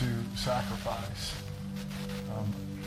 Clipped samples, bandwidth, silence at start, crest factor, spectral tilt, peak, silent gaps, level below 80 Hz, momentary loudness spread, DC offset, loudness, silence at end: under 0.1%; 16 kHz; 0 s; 14 dB; -5.5 dB/octave; -20 dBFS; none; -48 dBFS; 7 LU; under 0.1%; -35 LUFS; 0 s